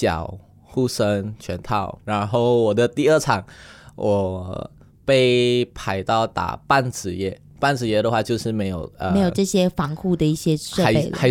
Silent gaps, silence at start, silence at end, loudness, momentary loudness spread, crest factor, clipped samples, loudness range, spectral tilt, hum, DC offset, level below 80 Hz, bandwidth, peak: none; 0 s; 0 s; -21 LUFS; 11 LU; 18 dB; under 0.1%; 2 LU; -5.5 dB/octave; none; under 0.1%; -46 dBFS; 17 kHz; -2 dBFS